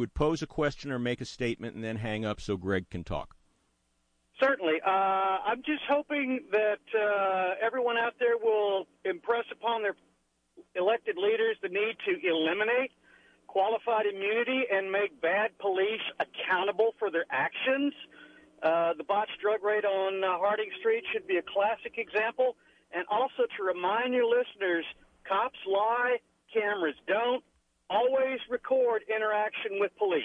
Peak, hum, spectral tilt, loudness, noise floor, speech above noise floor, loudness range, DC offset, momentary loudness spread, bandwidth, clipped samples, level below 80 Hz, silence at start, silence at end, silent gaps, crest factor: -16 dBFS; none; -5.5 dB/octave; -30 LUFS; -74 dBFS; 45 dB; 2 LU; under 0.1%; 7 LU; 9.6 kHz; under 0.1%; -58 dBFS; 0 s; 0 s; none; 14 dB